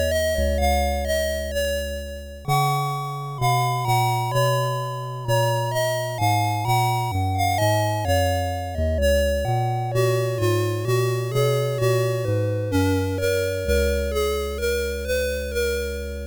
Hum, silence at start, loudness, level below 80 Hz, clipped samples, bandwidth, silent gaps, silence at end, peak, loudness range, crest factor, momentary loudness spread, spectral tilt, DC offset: none; 0 s; -23 LUFS; -32 dBFS; under 0.1%; over 20 kHz; none; 0 s; -10 dBFS; 2 LU; 12 dB; 4 LU; -5.5 dB/octave; 0.2%